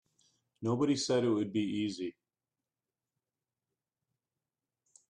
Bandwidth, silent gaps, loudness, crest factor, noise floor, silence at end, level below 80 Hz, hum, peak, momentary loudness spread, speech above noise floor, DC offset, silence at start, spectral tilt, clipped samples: 11 kHz; none; -33 LUFS; 18 dB; under -90 dBFS; 3 s; -76 dBFS; none; -20 dBFS; 11 LU; over 58 dB; under 0.1%; 0.6 s; -5.5 dB/octave; under 0.1%